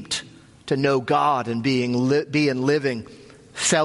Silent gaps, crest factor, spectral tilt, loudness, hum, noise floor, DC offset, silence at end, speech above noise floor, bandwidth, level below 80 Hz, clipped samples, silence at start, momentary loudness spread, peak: none; 16 dB; -4.5 dB/octave; -22 LUFS; none; -43 dBFS; under 0.1%; 0 s; 22 dB; 11.5 kHz; -60 dBFS; under 0.1%; 0 s; 12 LU; -6 dBFS